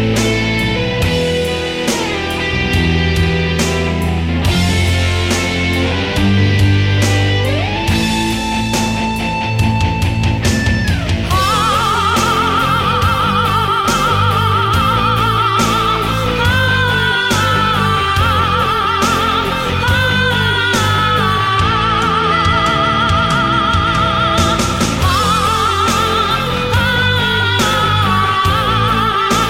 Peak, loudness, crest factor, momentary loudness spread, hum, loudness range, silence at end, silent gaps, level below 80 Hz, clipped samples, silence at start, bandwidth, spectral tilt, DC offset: -2 dBFS; -13 LUFS; 12 dB; 3 LU; none; 2 LU; 0 s; none; -26 dBFS; under 0.1%; 0 s; 16.5 kHz; -4.5 dB/octave; under 0.1%